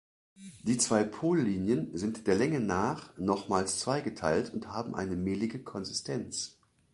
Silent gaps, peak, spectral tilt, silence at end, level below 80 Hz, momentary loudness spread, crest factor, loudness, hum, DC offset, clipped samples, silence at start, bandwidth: none; -12 dBFS; -4.5 dB/octave; 0.45 s; -58 dBFS; 9 LU; 20 dB; -32 LUFS; none; under 0.1%; under 0.1%; 0.4 s; 11.5 kHz